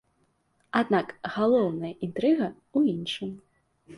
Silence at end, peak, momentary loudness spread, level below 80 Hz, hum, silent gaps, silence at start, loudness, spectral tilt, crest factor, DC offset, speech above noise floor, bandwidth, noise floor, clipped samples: 0 s; -8 dBFS; 10 LU; -68 dBFS; none; none; 0.75 s; -27 LUFS; -7 dB/octave; 20 dB; under 0.1%; 44 dB; 11.5 kHz; -70 dBFS; under 0.1%